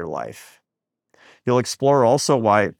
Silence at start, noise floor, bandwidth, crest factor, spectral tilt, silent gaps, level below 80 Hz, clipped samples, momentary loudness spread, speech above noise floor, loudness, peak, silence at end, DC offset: 0 s; -83 dBFS; 17 kHz; 18 dB; -5 dB/octave; none; -68 dBFS; under 0.1%; 14 LU; 64 dB; -19 LUFS; -2 dBFS; 0.05 s; under 0.1%